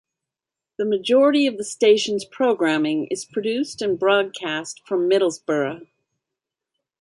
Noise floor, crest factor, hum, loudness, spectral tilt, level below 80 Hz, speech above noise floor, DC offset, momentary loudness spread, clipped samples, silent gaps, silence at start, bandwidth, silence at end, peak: -88 dBFS; 18 dB; none; -21 LUFS; -4 dB/octave; -70 dBFS; 67 dB; under 0.1%; 10 LU; under 0.1%; none; 0.8 s; 11.5 kHz; 1.15 s; -4 dBFS